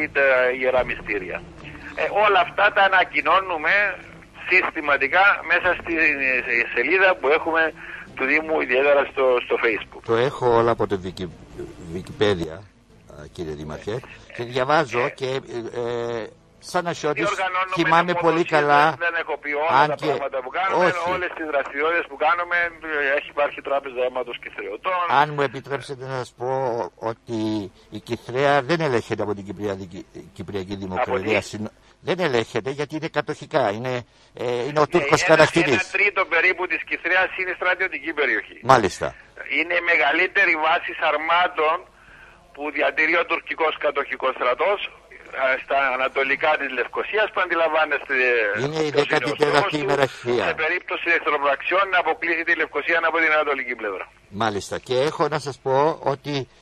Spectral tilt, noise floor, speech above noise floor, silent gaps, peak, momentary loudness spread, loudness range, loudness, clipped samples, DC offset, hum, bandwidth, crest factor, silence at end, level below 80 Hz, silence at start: -4.5 dB/octave; -48 dBFS; 26 dB; none; 0 dBFS; 14 LU; 7 LU; -21 LUFS; under 0.1%; under 0.1%; none; 13 kHz; 22 dB; 0.15 s; -52 dBFS; 0 s